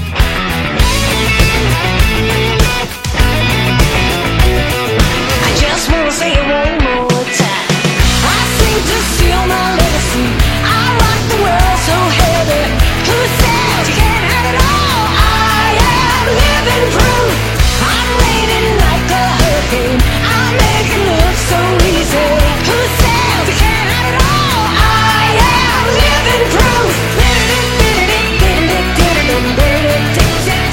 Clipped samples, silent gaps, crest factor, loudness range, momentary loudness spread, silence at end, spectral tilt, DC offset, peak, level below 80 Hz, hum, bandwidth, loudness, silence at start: 0.1%; none; 10 dB; 2 LU; 3 LU; 0 s; -4 dB/octave; under 0.1%; 0 dBFS; -16 dBFS; none; 17 kHz; -11 LUFS; 0 s